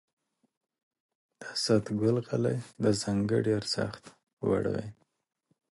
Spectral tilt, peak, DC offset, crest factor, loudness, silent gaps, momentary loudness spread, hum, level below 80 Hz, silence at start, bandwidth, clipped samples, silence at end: -5.5 dB/octave; -12 dBFS; under 0.1%; 20 dB; -30 LUFS; 4.33-4.37 s; 10 LU; none; -60 dBFS; 1.4 s; 11.5 kHz; under 0.1%; 0.85 s